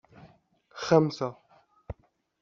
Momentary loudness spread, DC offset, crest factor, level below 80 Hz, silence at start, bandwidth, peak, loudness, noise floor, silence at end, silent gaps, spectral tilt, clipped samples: 23 LU; under 0.1%; 24 dB; -58 dBFS; 0.75 s; 7.4 kHz; -6 dBFS; -27 LUFS; -61 dBFS; 0.5 s; none; -6 dB/octave; under 0.1%